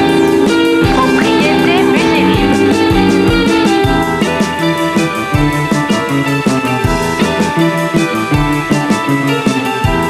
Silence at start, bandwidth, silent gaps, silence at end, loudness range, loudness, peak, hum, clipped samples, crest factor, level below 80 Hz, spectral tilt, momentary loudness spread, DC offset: 0 s; 15.5 kHz; none; 0 s; 3 LU; -12 LUFS; 0 dBFS; none; under 0.1%; 10 dB; -28 dBFS; -5.5 dB/octave; 4 LU; under 0.1%